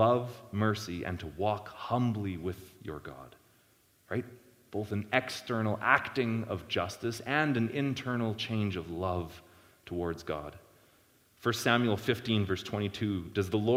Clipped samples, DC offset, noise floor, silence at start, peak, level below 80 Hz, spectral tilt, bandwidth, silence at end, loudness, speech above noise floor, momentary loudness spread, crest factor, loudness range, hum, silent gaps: under 0.1%; under 0.1%; -66 dBFS; 0 s; -6 dBFS; -60 dBFS; -6 dB/octave; 16.5 kHz; 0 s; -32 LUFS; 35 dB; 13 LU; 26 dB; 7 LU; none; none